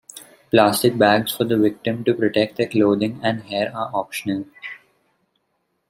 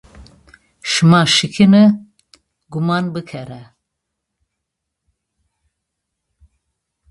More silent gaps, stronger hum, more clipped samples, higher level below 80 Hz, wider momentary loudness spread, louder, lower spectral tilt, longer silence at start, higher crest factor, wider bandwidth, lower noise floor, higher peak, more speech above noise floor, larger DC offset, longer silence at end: neither; neither; neither; second, -62 dBFS vs -54 dBFS; second, 14 LU vs 20 LU; second, -20 LUFS vs -13 LUFS; about the same, -5 dB/octave vs -5 dB/octave; about the same, 0.15 s vs 0.2 s; about the same, 20 dB vs 18 dB; first, 16 kHz vs 11.5 kHz; second, -71 dBFS vs -78 dBFS; about the same, -2 dBFS vs 0 dBFS; second, 52 dB vs 65 dB; neither; second, 1.15 s vs 3.45 s